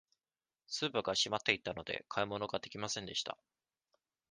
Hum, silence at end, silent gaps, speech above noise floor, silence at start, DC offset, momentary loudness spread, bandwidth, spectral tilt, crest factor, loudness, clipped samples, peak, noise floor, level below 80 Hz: none; 0.95 s; none; over 52 dB; 0.7 s; under 0.1%; 9 LU; 10 kHz; -2.5 dB/octave; 28 dB; -37 LUFS; under 0.1%; -12 dBFS; under -90 dBFS; -70 dBFS